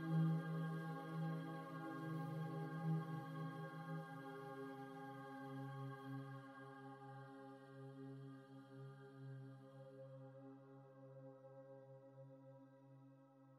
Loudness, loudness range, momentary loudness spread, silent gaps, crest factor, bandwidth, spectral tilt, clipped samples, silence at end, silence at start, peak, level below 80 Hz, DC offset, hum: -50 LUFS; 13 LU; 17 LU; none; 18 dB; 12.5 kHz; -8.5 dB/octave; under 0.1%; 0 s; 0 s; -32 dBFS; under -90 dBFS; under 0.1%; none